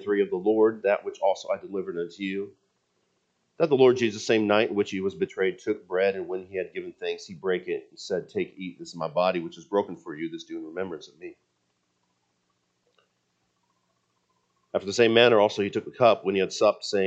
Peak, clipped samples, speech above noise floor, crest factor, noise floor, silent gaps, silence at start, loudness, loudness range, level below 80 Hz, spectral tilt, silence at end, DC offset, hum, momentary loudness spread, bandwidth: -4 dBFS; under 0.1%; 49 dB; 22 dB; -74 dBFS; none; 0 s; -26 LUFS; 14 LU; -76 dBFS; -5 dB/octave; 0 s; under 0.1%; none; 15 LU; 8.2 kHz